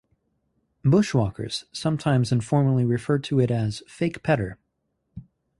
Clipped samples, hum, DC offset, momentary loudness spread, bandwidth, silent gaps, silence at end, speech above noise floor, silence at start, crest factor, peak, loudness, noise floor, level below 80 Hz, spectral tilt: under 0.1%; none; under 0.1%; 8 LU; 11.5 kHz; none; 0.35 s; 53 dB; 0.85 s; 16 dB; -8 dBFS; -24 LUFS; -75 dBFS; -52 dBFS; -7 dB/octave